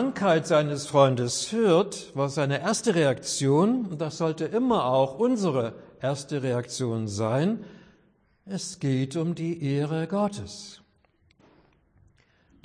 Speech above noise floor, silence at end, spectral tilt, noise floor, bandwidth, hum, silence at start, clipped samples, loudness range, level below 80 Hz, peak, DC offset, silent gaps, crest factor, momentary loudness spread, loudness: 40 dB; 1.9 s; -5.5 dB/octave; -65 dBFS; 10.5 kHz; none; 0 s; under 0.1%; 6 LU; -64 dBFS; -6 dBFS; under 0.1%; none; 20 dB; 10 LU; -26 LUFS